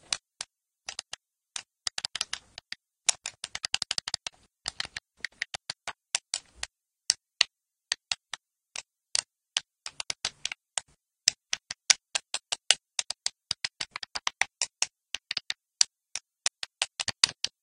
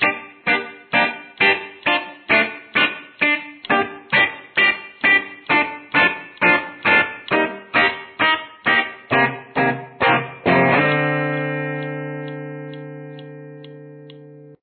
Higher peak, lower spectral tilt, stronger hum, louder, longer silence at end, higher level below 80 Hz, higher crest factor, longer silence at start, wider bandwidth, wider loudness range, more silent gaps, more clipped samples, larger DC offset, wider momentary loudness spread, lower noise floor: first, 0 dBFS vs -4 dBFS; second, 2.5 dB/octave vs -8 dB/octave; neither; second, -31 LUFS vs -18 LUFS; about the same, 0.15 s vs 0.1 s; second, -68 dBFS vs -60 dBFS; first, 34 dB vs 18 dB; about the same, 0.1 s vs 0 s; first, 15.5 kHz vs 4.5 kHz; about the same, 6 LU vs 4 LU; neither; neither; neither; about the same, 16 LU vs 15 LU; first, -49 dBFS vs -42 dBFS